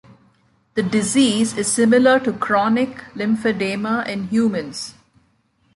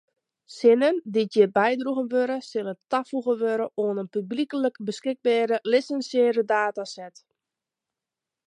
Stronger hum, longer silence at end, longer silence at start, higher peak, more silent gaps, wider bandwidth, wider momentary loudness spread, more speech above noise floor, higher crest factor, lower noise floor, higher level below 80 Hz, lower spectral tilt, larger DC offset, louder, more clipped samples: neither; second, 0.85 s vs 1.4 s; first, 0.75 s vs 0.5 s; about the same, -4 dBFS vs -6 dBFS; neither; about the same, 11.5 kHz vs 10.5 kHz; about the same, 12 LU vs 10 LU; second, 44 dB vs 64 dB; about the same, 16 dB vs 18 dB; second, -62 dBFS vs -88 dBFS; first, -58 dBFS vs -82 dBFS; second, -4 dB/octave vs -5.5 dB/octave; neither; first, -19 LUFS vs -24 LUFS; neither